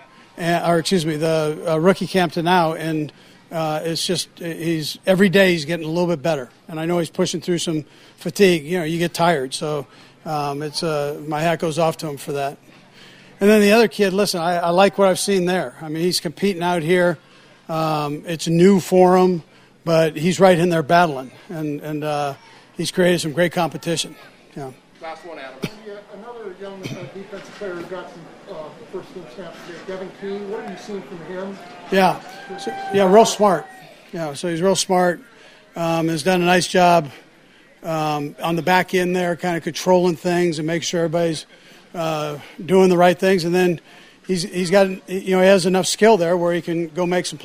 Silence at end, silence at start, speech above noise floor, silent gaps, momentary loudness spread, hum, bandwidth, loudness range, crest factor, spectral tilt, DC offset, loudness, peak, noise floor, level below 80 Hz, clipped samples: 0 s; 0.35 s; 31 dB; none; 20 LU; none; 16 kHz; 15 LU; 20 dB; -5 dB/octave; under 0.1%; -19 LUFS; 0 dBFS; -50 dBFS; -56 dBFS; under 0.1%